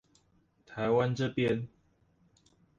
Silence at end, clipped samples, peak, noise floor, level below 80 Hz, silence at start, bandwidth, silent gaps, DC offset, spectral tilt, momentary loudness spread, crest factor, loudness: 1.1 s; under 0.1%; -16 dBFS; -69 dBFS; -66 dBFS; 0.7 s; 7.8 kHz; none; under 0.1%; -7 dB/octave; 16 LU; 18 dB; -31 LUFS